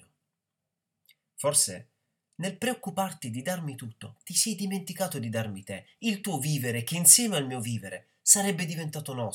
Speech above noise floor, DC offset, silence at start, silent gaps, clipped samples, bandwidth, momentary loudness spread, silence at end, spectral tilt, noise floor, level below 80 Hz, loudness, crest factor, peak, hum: 57 dB; under 0.1%; 1.4 s; none; under 0.1%; over 20 kHz; 18 LU; 0 s; -2.5 dB/octave; -86 dBFS; -80 dBFS; -26 LUFS; 28 dB; -2 dBFS; none